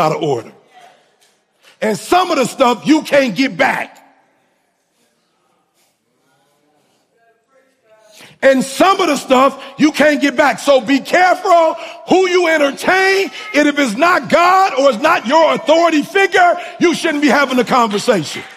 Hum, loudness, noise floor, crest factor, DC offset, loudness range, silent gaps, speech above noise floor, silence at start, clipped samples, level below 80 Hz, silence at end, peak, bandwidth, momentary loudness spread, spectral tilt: none; -13 LUFS; -62 dBFS; 14 dB; under 0.1%; 6 LU; none; 49 dB; 0 s; under 0.1%; -58 dBFS; 0.05 s; 0 dBFS; 15.5 kHz; 5 LU; -4 dB/octave